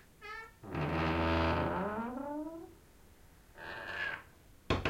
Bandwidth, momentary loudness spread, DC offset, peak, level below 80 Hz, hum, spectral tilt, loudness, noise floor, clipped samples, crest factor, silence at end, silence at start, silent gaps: 16.5 kHz; 16 LU; under 0.1%; -18 dBFS; -52 dBFS; none; -6.5 dB/octave; -37 LUFS; -59 dBFS; under 0.1%; 20 dB; 0 s; 0.2 s; none